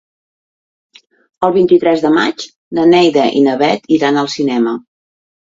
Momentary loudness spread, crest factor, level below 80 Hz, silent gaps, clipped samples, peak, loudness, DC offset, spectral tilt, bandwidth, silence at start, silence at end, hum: 9 LU; 14 dB; -56 dBFS; 2.56-2.71 s; under 0.1%; 0 dBFS; -12 LUFS; under 0.1%; -5.5 dB/octave; 7.8 kHz; 1.4 s; 0.75 s; none